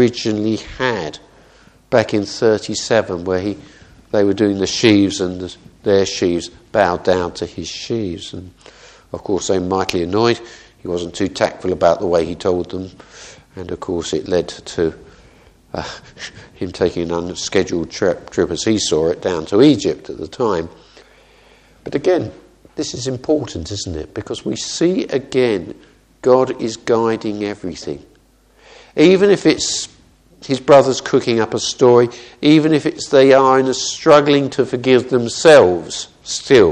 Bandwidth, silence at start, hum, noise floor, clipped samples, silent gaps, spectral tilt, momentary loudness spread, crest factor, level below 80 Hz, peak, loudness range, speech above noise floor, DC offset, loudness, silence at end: 10 kHz; 0 s; none; -52 dBFS; under 0.1%; none; -4.5 dB/octave; 17 LU; 16 dB; -48 dBFS; 0 dBFS; 10 LU; 36 dB; under 0.1%; -16 LUFS; 0 s